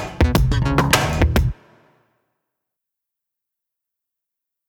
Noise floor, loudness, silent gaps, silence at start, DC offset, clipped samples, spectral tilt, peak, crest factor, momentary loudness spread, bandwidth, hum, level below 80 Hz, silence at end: -83 dBFS; -18 LUFS; none; 0 s; under 0.1%; under 0.1%; -5 dB/octave; 0 dBFS; 22 dB; 4 LU; 19 kHz; none; -26 dBFS; 3.15 s